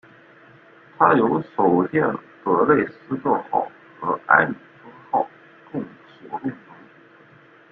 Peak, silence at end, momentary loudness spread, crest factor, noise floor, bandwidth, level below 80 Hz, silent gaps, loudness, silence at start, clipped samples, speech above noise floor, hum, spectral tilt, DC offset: -2 dBFS; 1.15 s; 16 LU; 22 dB; -50 dBFS; 4.6 kHz; -64 dBFS; none; -21 LUFS; 1 s; under 0.1%; 31 dB; none; -10 dB/octave; under 0.1%